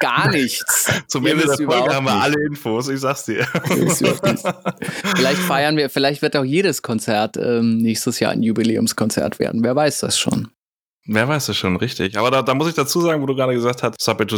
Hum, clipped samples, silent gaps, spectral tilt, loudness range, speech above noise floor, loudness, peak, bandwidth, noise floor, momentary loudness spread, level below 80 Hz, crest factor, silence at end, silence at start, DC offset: none; under 0.1%; 10.68-11.00 s; -4 dB/octave; 1 LU; 54 dB; -18 LUFS; 0 dBFS; over 20 kHz; -72 dBFS; 5 LU; -56 dBFS; 18 dB; 0 s; 0 s; under 0.1%